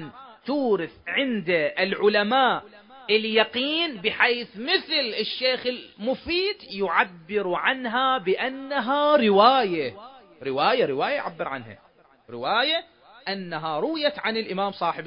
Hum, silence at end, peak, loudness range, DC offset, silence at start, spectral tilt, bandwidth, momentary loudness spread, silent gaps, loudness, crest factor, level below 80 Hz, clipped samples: none; 0 s; -2 dBFS; 5 LU; under 0.1%; 0 s; -8.5 dB/octave; 5.4 kHz; 11 LU; none; -23 LUFS; 22 dB; -64 dBFS; under 0.1%